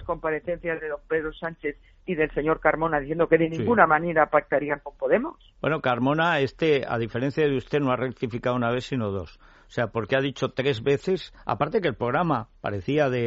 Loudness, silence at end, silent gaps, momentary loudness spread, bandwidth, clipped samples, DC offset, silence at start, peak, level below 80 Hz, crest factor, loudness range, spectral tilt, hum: -25 LUFS; 0 s; none; 10 LU; 7.6 kHz; under 0.1%; under 0.1%; 0 s; -2 dBFS; -50 dBFS; 22 dB; 4 LU; -4.5 dB/octave; none